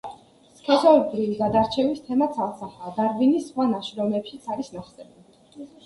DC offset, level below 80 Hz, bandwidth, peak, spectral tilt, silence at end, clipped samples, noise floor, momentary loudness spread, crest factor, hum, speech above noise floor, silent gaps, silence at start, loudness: under 0.1%; -58 dBFS; 11.5 kHz; -4 dBFS; -6.5 dB/octave; 0.2 s; under 0.1%; -53 dBFS; 18 LU; 20 dB; none; 30 dB; none; 0.05 s; -23 LUFS